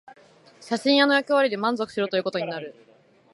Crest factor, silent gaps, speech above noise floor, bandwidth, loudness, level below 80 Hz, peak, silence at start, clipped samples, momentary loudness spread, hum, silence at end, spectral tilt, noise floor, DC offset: 18 dB; none; 29 dB; 11.5 kHz; -23 LUFS; -76 dBFS; -6 dBFS; 0.1 s; under 0.1%; 13 LU; none; 0.6 s; -4.5 dB/octave; -52 dBFS; under 0.1%